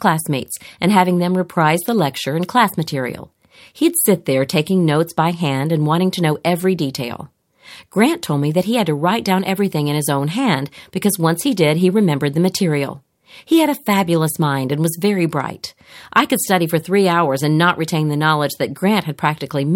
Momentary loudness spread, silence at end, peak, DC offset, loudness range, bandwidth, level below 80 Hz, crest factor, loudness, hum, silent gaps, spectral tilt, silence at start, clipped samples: 7 LU; 0 s; 0 dBFS; under 0.1%; 2 LU; 17 kHz; -60 dBFS; 16 dB; -17 LUFS; none; none; -5.5 dB/octave; 0 s; under 0.1%